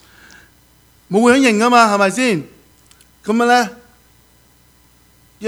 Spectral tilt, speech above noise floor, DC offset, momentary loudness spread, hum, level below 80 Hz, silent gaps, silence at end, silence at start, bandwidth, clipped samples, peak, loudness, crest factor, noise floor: -4 dB/octave; 39 dB; under 0.1%; 11 LU; none; -56 dBFS; none; 0 s; 1.1 s; over 20 kHz; under 0.1%; 0 dBFS; -14 LUFS; 18 dB; -52 dBFS